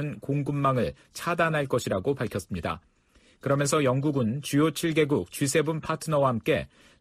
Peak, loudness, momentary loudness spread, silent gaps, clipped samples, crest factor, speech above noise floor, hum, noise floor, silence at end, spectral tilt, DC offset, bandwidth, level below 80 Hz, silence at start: -12 dBFS; -27 LUFS; 8 LU; none; under 0.1%; 16 dB; 35 dB; none; -61 dBFS; 0.35 s; -5.5 dB/octave; under 0.1%; 15.5 kHz; -54 dBFS; 0 s